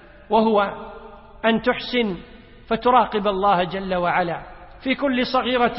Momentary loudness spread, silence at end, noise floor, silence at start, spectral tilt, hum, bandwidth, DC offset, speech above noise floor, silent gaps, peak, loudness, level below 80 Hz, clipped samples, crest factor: 14 LU; 0 s; -41 dBFS; 0.3 s; -9.5 dB/octave; none; 5.8 kHz; under 0.1%; 21 dB; none; -4 dBFS; -21 LUFS; -46 dBFS; under 0.1%; 18 dB